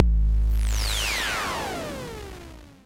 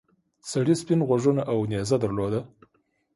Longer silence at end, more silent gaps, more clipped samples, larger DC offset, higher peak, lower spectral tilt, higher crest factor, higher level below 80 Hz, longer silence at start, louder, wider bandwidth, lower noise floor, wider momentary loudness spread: second, 0.15 s vs 0.7 s; neither; neither; neither; first, 0 dBFS vs -10 dBFS; second, -3.5 dB/octave vs -6.5 dB/octave; first, 24 dB vs 16 dB; first, -26 dBFS vs -56 dBFS; second, 0 s vs 0.45 s; about the same, -26 LUFS vs -25 LUFS; first, 16.5 kHz vs 11.5 kHz; second, -43 dBFS vs -70 dBFS; first, 16 LU vs 8 LU